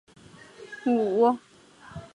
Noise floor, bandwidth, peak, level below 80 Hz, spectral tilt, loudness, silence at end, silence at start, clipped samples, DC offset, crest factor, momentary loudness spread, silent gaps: -48 dBFS; 10.5 kHz; -10 dBFS; -62 dBFS; -7 dB/octave; -25 LUFS; 0.1 s; 0.6 s; under 0.1%; under 0.1%; 18 dB; 22 LU; none